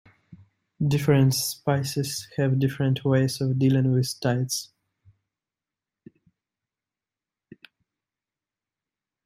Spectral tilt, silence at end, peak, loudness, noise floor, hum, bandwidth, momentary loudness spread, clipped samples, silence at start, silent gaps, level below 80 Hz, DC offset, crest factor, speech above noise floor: -6 dB/octave; 4.6 s; -8 dBFS; -24 LUFS; under -90 dBFS; none; 16 kHz; 9 LU; under 0.1%; 0.3 s; none; -62 dBFS; under 0.1%; 20 dB; over 67 dB